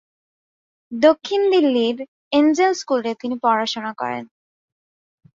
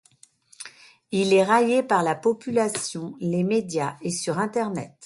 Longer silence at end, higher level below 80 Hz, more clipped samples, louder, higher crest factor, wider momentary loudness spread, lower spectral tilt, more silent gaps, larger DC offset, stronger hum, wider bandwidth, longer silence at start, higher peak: first, 1.15 s vs 0 s; about the same, -68 dBFS vs -68 dBFS; neither; first, -19 LUFS vs -23 LUFS; about the same, 18 dB vs 18 dB; about the same, 11 LU vs 12 LU; about the same, -4 dB/octave vs -5 dB/octave; first, 2.08-2.31 s vs none; neither; neither; second, 7.8 kHz vs 11.5 kHz; first, 0.9 s vs 0.6 s; first, -2 dBFS vs -6 dBFS